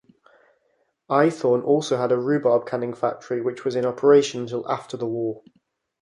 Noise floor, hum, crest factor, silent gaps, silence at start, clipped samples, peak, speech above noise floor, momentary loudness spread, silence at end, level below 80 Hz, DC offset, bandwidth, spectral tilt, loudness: -69 dBFS; none; 18 dB; none; 1.1 s; under 0.1%; -4 dBFS; 47 dB; 11 LU; 0.6 s; -70 dBFS; under 0.1%; 10.5 kHz; -6 dB/octave; -22 LUFS